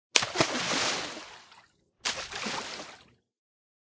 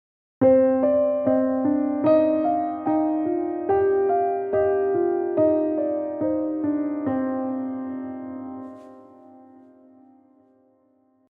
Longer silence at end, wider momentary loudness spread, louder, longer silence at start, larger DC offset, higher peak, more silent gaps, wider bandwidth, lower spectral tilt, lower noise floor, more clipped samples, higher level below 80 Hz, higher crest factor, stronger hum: second, 0.9 s vs 1.95 s; first, 19 LU vs 13 LU; second, -30 LUFS vs -22 LUFS; second, 0.15 s vs 0.4 s; neither; first, 0 dBFS vs -6 dBFS; neither; first, 8 kHz vs 4.8 kHz; second, -1.5 dB/octave vs -11 dB/octave; about the same, -61 dBFS vs -62 dBFS; neither; about the same, -64 dBFS vs -62 dBFS; first, 32 dB vs 16 dB; neither